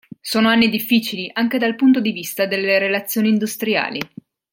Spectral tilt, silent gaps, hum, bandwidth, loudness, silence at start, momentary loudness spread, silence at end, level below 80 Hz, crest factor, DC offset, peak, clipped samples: -4.5 dB/octave; none; none; 17 kHz; -18 LUFS; 0.25 s; 8 LU; 0.45 s; -62 dBFS; 16 dB; under 0.1%; -2 dBFS; under 0.1%